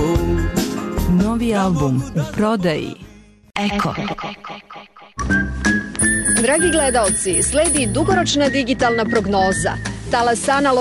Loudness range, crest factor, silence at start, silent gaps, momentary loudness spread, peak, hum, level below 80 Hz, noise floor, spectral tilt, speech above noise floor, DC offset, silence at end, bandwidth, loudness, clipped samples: 7 LU; 14 dB; 0 s; none; 13 LU; -4 dBFS; none; -32 dBFS; -39 dBFS; -4 dB/octave; 22 dB; under 0.1%; 0 s; 13.5 kHz; -17 LUFS; under 0.1%